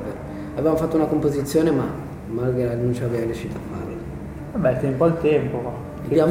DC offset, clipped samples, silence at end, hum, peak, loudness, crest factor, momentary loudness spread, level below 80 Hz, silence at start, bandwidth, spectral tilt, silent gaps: under 0.1%; under 0.1%; 0 s; none; -6 dBFS; -23 LUFS; 16 dB; 12 LU; -42 dBFS; 0 s; 16.5 kHz; -8 dB/octave; none